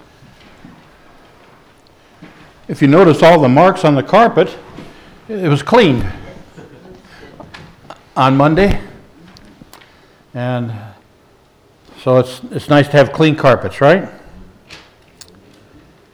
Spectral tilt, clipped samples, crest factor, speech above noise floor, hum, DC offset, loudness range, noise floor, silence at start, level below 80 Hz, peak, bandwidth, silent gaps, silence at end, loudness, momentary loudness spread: -7 dB/octave; under 0.1%; 14 dB; 39 dB; none; under 0.1%; 8 LU; -49 dBFS; 2.7 s; -36 dBFS; 0 dBFS; 13.5 kHz; none; 1.4 s; -12 LUFS; 19 LU